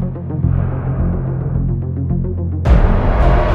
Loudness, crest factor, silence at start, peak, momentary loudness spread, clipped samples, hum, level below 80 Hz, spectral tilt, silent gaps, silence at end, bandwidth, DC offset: -17 LUFS; 14 dB; 0 s; 0 dBFS; 6 LU; under 0.1%; none; -18 dBFS; -9.5 dB/octave; none; 0 s; 5.4 kHz; under 0.1%